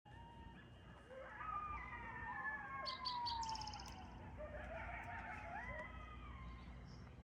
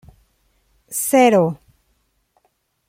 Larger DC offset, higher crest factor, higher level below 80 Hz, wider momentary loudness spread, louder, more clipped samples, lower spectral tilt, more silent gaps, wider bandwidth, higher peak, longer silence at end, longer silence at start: neither; about the same, 16 dB vs 18 dB; about the same, -60 dBFS vs -60 dBFS; about the same, 14 LU vs 15 LU; second, -49 LUFS vs -16 LUFS; neither; about the same, -4 dB/octave vs -4.5 dB/octave; neither; about the same, 15.5 kHz vs 16.5 kHz; second, -34 dBFS vs -2 dBFS; second, 0 s vs 1.35 s; second, 0.05 s vs 0.9 s